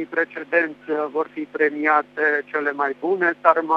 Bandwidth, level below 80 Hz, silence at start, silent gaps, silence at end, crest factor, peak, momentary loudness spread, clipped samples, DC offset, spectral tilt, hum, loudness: 6.6 kHz; -78 dBFS; 0 s; none; 0 s; 22 dB; 0 dBFS; 7 LU; under 0.1%; under 0.1%; -6.5 dB/octave; 50 Hz at -65 dBFS; -21 LUFS